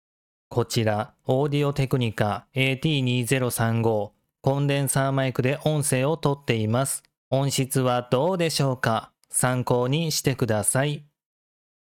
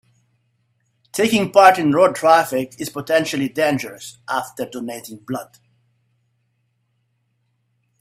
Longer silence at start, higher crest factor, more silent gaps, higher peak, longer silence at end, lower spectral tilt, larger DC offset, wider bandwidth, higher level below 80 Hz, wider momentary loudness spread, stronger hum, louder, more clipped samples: second, 0.5 s vs 1.15 s; about the same, 18 dB vs 20 dB; first, 7.18-7.31 s vs none; second, -6 dBFS vs 0 dBFS; second, 1 s vs 2.55 s; about the same, -5 dB/octave vs -4.5 dB/octave; neither; about the same, 17.5 kHz vs 16 kHz; first, -54 dBFS vs -64 dBFS; second, 5 LU vs 18 LU; neither; second, -24 LUFS vs -18 LUFS; neither